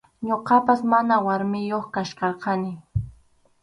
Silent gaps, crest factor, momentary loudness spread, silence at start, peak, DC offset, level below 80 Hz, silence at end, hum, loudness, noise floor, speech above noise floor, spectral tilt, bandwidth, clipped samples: none; 18 dB; 12 LU; 0.2 s; -6 dBFS; under 0.1%; -48 dBFS; 0.5 s; none; -23 LUFS; -57 dBFS; 35 dB; -7 dB/octave; 11 kHz; under 0.1%